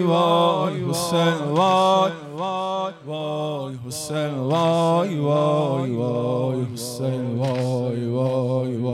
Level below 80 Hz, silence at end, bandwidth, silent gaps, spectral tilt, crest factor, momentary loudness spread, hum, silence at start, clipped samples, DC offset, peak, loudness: -68 dBFS; 0 s; 15.5 kHz; none; -6 dB/octave; 14 dB; 10 LU; none; 0 s; under 0.1%; under 0.1%; -8 dBFS; -22 LUFS